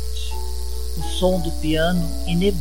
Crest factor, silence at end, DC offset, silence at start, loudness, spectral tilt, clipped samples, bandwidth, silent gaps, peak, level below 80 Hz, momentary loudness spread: 16 dB; 0 s; 6%; 0 s; -23 LUFS; -5.5 dB/octave; under 0.1%; 17 kHz; none; -6 dBFS; -28 dBFS; 9 LU